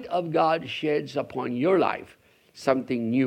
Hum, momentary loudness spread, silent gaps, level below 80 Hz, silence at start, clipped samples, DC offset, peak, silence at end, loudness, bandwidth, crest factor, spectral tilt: none; 8 LU; none; -68 dBFS; 0 s; under 0.1%; under 0.1%; -6 dBFS; 0 s; -26 LUFS; 12.5 kHz; 20 dB; -6.5 dB/octave